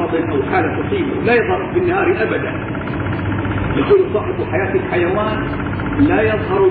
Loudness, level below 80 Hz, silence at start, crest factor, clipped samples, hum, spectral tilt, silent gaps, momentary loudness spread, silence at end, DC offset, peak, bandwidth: -17 LUFS; -34 dBFS; 0 s; 14 dB; under 0.1%; none; -11.5 dB/octave; none; 7 LU; 0 s; under 0.1%; -2 dBFS; 4.7 kHz